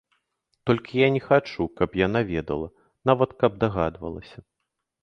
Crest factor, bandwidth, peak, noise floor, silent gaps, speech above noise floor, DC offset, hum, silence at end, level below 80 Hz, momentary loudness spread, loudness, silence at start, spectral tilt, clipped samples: 22 dB; 6.6 kHz; -2 dBFS; -81 dBFS; none; 57 dB; under 0.1%; none; 0.75 s; -48 dBFS; 13 LU; -24 LUFS; 0.65 s; -8 dB/octave; under 0.1%